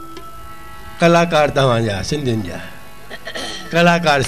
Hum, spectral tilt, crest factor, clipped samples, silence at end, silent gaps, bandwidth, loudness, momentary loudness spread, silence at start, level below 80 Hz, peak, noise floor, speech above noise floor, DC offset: none; -5 dB/octave; 16 dB; under 0.1%; 0 s; none; 14 kHz; -16 LUFS; 23 LU; 0 s; -42 dBFS; -2 dBFS; -36 dBFS; 22 dB; 2%